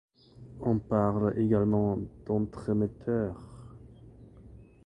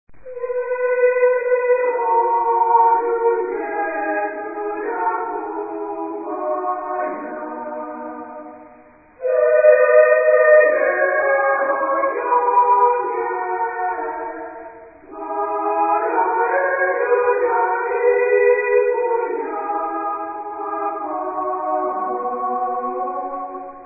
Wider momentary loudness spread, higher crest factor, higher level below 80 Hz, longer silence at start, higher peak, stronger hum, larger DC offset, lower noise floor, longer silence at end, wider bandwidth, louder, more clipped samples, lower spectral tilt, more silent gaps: first, 21 LU vs 15 LU; about the same, 18 dB vs 18 dB; first, -52 dBFS vs -64 dBFS; first, 0.4 s vs 0.1 s; second, -12 dBFS vs -2 dBFS; neither; neither; first, -52 dBFS vs -47 dBFS; first, 0.25 s vs 0 s; first, 9.4 kHz vs 2.7 kHz; second, -29 LUFS vs -19 LUFS; neither; about the same, -10.5 dB/octave vs -11.5 dB/octave; neither